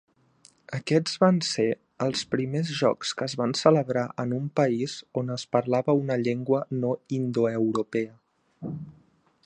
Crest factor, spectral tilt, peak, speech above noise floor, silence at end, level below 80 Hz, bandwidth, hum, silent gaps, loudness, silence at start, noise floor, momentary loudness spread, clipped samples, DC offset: 22 dB; -6 dB/octave; -4 dBFS; 36 dB; 0.55 s; -68 dBFS; 9.8 kHz; none; none; -26 LUFS; 0.7 s; -61 dBFS; 12 LU; under 0.1%; under 0.1%